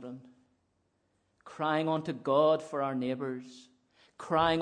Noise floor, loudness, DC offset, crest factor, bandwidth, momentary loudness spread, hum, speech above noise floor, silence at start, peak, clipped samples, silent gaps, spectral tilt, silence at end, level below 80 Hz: -76 dBFS; -30 LUFS; under 0.1%; 20 dB; 10 kHz; 22 LU; none; 45 dB; 0 s; -12 dBFS; under 0.1%; none; -6.5 dB/octave; 0 s; -66 dBFS